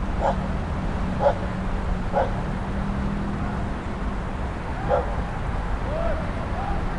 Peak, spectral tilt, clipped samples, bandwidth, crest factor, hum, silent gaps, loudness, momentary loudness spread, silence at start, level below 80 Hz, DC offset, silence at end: -8 dBFS; -7.5 dB/octave; under 0.1%; 11 kHz; 18 dB; none; none; -27 LUFS; 6 LU; 0 s; -30 dBFS; under 0.1%; 0 s